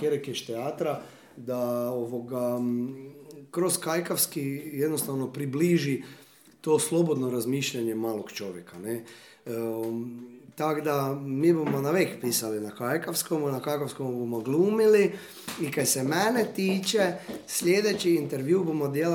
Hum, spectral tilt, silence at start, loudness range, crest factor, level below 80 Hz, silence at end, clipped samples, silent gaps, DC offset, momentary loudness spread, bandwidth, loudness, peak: none; -4.5 dB/octave; 0 s; 6 LU; 18 dB; -76 dBFS; 0 s; under 0.1%; none; under 0.1%; 13 LU; 19 kHz; -28 LUFS; -10 dBFS